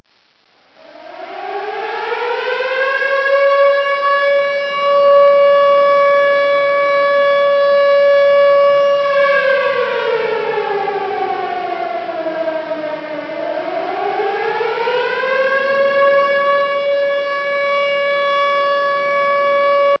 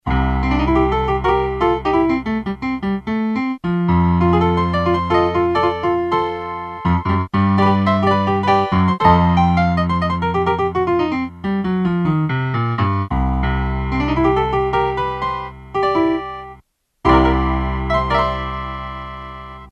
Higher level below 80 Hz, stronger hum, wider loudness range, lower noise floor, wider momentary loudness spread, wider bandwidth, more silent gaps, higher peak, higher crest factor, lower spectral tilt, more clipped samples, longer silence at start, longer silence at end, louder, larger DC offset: second, -70 dBFS vs -28 dBFS; neither; first, 9 LU vs 4 LU; first, -56 dBFS vs -51 dBFS; about the same, 11 LU vs 9 LU; second, 6 kHz vs 7.6 kHz; neither; about the same, 0 dBFS vs 0 dBFS; about the same, 14 dB vs 16 dB; second, -4 dB/octave vs -8.5 dB/octave; neither; first, 0.95 s vs 0.05 s; about the same, 0.05 s vs 0 s; first, -14 LUFS vs -18 LUFS; neither